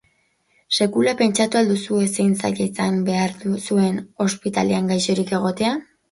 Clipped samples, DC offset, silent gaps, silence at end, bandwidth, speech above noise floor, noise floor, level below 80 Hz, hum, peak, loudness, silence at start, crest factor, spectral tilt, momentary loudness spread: under 0.1%; under 0.1%; none; 0.3 s; 11.5 kHz; 44 dB; -64 dBFS; -60 dBFS; none; -4 dBFS; -20 LUFS; 0.7 s; 16 dB; -5 dB/octave; 5 LU